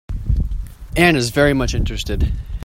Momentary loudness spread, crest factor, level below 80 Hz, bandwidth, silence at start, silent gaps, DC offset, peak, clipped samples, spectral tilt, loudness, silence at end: 11 LU; 18 dB; -24 dBFS; 16.5 kHz; 0.1 s; none; under 0.1%; 0 dBFS; under 0.1%; -5.5 dB/octave; -18 LUFS; 0 s